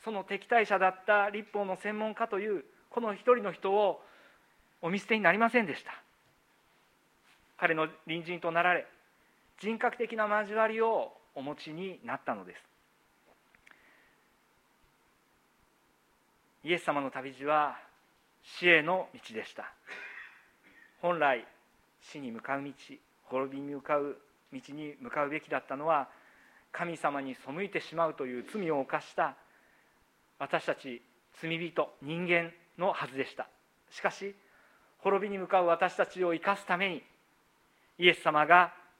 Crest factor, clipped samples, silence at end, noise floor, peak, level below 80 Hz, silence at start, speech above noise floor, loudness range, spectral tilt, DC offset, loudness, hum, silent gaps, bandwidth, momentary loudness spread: 28 dB; under 0.1%; 0.2 s; -69 dBFS; -6 dBFS; -82 dBFS; 0.05 s; 38 dB; 7 LU; -5 dB/octave; under 0.1%; -31 LUFS; none; none; 15.5 kHz; 18 LU